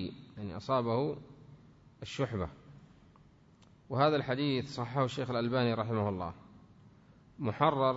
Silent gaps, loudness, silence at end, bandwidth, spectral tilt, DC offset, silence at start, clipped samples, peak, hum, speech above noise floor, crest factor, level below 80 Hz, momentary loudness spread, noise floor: none; -33 LUFS; 0 s; 7.6 kHz; -5.5 dB/octave; under 0.1%; 0 s; under 0.1%; -14 dBFS; none; 29 dB; 20 dB; -62 dBFS; 14 LU; -61 dBFS